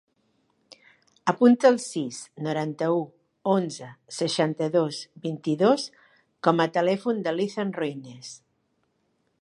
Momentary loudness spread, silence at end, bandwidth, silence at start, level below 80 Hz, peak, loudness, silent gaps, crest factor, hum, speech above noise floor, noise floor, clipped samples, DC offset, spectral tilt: 16 LU; 1.05 s; 11.5 kHz; 1.25 s; -78 dBFS; -4 dBFS; -25 LUFS; none; 22 dB; none; 48 dB; -72 dBFS; under 0.1%; under 0.1%; -5.5 dB/octave